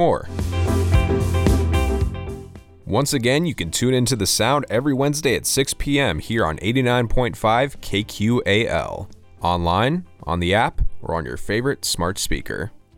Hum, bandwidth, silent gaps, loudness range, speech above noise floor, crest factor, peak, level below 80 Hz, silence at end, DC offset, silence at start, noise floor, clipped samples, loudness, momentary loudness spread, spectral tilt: none; 17 kHz; none; 3 LU; 19 dB; 16 dB; -4 dBFS; -30 dBFS; 0.2 s; under 0.1%; 0 s; -39 dBFS; under 0.1%; -21 LUFS; 8 LU; -4.5 dB/octave